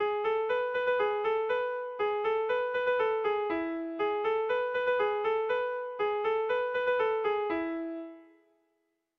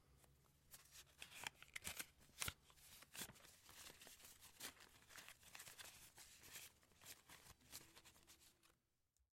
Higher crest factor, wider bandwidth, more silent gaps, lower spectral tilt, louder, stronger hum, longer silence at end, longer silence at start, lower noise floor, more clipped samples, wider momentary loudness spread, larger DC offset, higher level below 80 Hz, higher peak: second, 12 dB vs 38 dB; second, 6 kHz vs 16.5 kHz; neither; first, -5.5 dB/octave vs -1 dB/octave; first, -30 LUFS vs -57 LUFS; neither; first, 0.95 s vs 0.1 s; about the same, 0 s vs 0 s; second, -78 dBFS vs -87 dBFS; neither; second, 5 LU vs 14 LU; neither; first, -68 dBFS vs -78 dBFS; first, -18 dBFS vs -22 dBFS